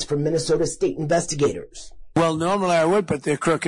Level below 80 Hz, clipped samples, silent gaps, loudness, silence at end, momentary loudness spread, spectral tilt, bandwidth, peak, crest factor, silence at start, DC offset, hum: -48 dBFS; under 0.1%; none; -22 LUFS; 0 s; 7 LU; -5 dB/octave; 11 kHz; -10 dBFS; 10 dB; 0 s; under 0.1%; none